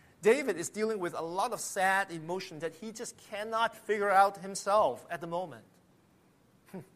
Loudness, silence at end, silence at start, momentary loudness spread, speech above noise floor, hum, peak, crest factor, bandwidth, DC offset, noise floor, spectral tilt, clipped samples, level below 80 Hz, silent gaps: -31 LUFS; 0.15 s; 0.2 s; 14 LU; 34 dB; none; -12 dBFS; 20 dB; 15 kHz; under 0.1%; -65 dBFS; -3.5 dB/octave; under 0.1%; -76 dBFS; none